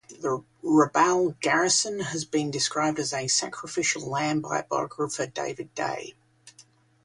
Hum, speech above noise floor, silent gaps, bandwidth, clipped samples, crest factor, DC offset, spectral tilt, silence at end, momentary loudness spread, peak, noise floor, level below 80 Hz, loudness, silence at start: none; 31 dB; none; 11.5 kHz; under 0.1%; 20 dB; under 0.1%; -3 dB/octave; 0.55 s; 10 LU; -6 dBFS; -58 dBFS; -68 dBFS; -26 LUFS; 0.1 s